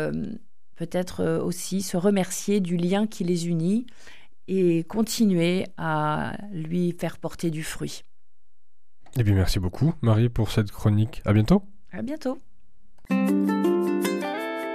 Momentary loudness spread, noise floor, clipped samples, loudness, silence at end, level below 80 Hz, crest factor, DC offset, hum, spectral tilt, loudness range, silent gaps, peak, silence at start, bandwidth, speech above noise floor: 11 LU; -79 dBFS; under 0.1%; -25 LUFS; 0 s; -42 dBFS; 18 dB; 1%; none; -6.5 dB/octave; 5 LU; none; -8 dBFS; 0 s; 15 kHz; 55 dB